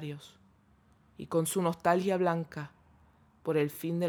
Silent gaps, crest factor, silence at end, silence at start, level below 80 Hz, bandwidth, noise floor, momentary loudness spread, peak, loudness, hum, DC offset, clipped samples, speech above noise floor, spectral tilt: none; 20 dB; 0 s; 0 s; -70 dBFS; over 20 kHz; -64 dBFS; 18 LU; -12 dBFS; -31 LUFS; none; under 0.1%; under 0.1%; 34 dB; -5.5 dB/octave